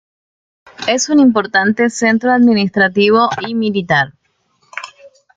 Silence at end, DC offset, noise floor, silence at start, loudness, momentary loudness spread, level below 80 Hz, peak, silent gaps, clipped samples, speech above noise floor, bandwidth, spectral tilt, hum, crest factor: 0.3 s; under 0.1%; -61 dBFS; 0.8 s; -13 LUFS; 18 LU; -58 dBFS; -2 dBFS; none; under 0.1%; 48 dB; 9.2 kHz; -4.5 dB/octave; none; 14 dB